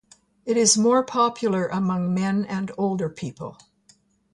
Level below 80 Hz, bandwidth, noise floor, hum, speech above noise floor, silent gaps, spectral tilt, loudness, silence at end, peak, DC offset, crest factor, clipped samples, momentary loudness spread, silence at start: -64 dBFS; 11.5 kHz; -60 dBFS; none; 38 dB; none; -4.5 dB/octave; -22 LUFS; 0.8 s; -4 dBFS; under 0.1%; 20 dB; under 0.1%; 16 LU; 0.45 s